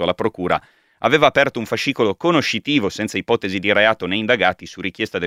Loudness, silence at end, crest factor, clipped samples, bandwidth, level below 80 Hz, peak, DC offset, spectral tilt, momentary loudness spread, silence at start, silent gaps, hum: -18 LUFS; 0 s; 18 dB; under 0.1%; 15.5 kHz; -54 dBFS; 0 dBFS; under 0.1%; -4.5 dB/octave; 8 LU; 0 s; none; none